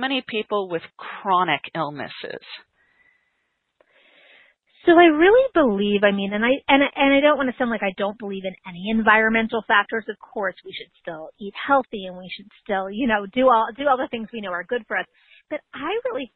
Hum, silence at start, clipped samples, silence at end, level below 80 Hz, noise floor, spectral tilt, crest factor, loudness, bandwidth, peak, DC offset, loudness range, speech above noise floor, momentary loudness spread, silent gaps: none; 0 s; under 0.1%; 0.1 s; -54 dBFS; -73 dBFS; -9 dB/octave; 22 dB; -20 LUFS; 4.4 kHz; 0 dBFS; under 0.1%; 10 LU; 52 dB; 19 LU; none